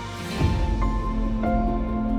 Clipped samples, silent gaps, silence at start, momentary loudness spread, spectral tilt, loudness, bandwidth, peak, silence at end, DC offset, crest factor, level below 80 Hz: under 0.1%; none; 0 s; 3 LU; -7 dB/octave; -25 LUFS; 12.5 kHz; -10 dBFS; 0 s; under 0.1%; 14 dB; -26 dBFS